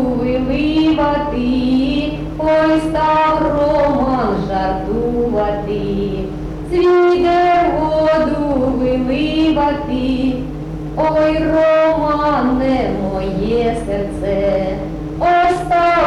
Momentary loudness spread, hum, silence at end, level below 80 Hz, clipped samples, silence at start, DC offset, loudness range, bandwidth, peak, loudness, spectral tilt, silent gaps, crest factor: 7 LU; none; 0 s; -30 dBFS; under 0.1%; 0 s; under 0.1%; 2 LU; 11 kHz; -6 dBFS; -16 LUFS; -7.5 dB/octave; none; 10 dB